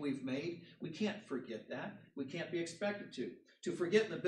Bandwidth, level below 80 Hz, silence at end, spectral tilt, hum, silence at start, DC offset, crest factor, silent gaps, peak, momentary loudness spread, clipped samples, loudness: 11.5 kHz; -86 dBFS; 0 s; -5.5 dB/octave; none; 0 s; under 0.1%; 22 dB; none; -18 dBFS; 13 LU; under 0.1%; -41 LUFS